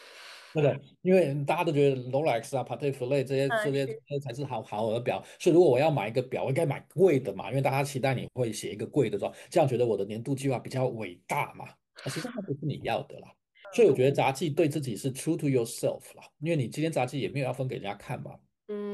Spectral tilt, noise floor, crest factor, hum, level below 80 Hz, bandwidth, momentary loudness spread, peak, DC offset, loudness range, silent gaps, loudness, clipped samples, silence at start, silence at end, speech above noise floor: -6.5 dB/octave; -49 dBFS; 18 dB; none; -70 dBFS; 12.5 kHz; 12 LU; -12 dBFS; under 0.1%; 5 LU; none; -29 LUFS; under 0.1%; 0 s; 0 s; 21 dB